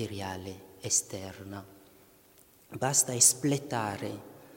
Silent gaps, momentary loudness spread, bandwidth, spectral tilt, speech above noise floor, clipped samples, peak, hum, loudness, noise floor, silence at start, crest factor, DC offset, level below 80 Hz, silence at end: none; 23 LU; 17 kHz; -2.5 dB/octave; 29 dB; under 0.1%; -8 dBFS; none; -27 LUFS; -60 dBFS; 0 s; 24 dB; under 0.1%; -68 dBFS; 0 s